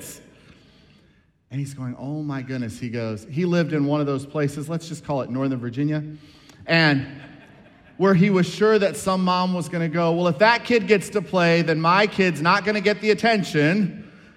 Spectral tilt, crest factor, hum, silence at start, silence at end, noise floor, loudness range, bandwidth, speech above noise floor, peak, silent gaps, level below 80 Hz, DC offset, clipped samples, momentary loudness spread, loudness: -6 dB/octave; 20 dB; none; 0 s; 0.3 s; -59 dBFS; 7 LU; 14 kHz; 38 dB; -2 dBFS; none; -60 dBFS; under 0.1%; under 0.1%; 12 LU; -21 LUFS